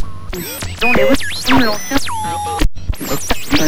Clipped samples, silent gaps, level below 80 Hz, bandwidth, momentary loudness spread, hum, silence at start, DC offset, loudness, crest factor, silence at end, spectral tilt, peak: under 0.1%; none; -26 dBFS; 16 kHz; 11 LU; none; 0 s; 9%; -17 LUFS; 14 dB; 0 s; -3.5 dB/octave; -2 dBFS